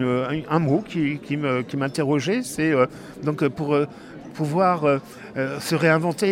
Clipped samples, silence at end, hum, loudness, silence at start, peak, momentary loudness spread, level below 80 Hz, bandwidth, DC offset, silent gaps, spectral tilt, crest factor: under 0.1%; 0 s; none; -23 LUFS; 0 s; -6 dBFS; 9 LU; -58 dBFS; 16 kHz; under 0.1%; none; -6 dB/octave; 16 dB